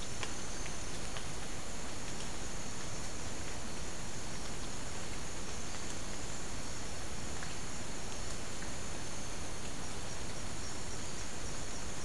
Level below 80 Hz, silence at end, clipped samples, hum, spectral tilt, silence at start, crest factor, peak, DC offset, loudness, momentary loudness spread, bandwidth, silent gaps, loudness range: -50 dBFS; 0 s; under 0.1%; none; -3 dB/octave; 0 s; 22 dB; -18 dBFS; 2%; -42 LUFS; 1 LU; 12 kHz; none; 0 LU